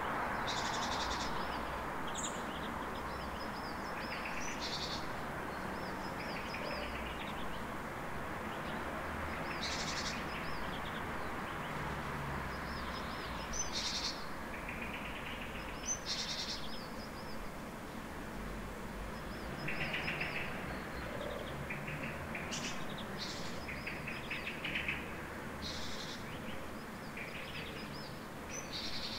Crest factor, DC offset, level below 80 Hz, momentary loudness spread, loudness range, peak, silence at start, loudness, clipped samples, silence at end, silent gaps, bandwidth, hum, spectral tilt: 16 dB; under 0.1%; -54 dBFS; 8 LU; 3 LU; -24 dBFS; 0 s; -40 LUFS; under 0.1%; 0 s; none; 16 kHz; none; -3.5 dB/octave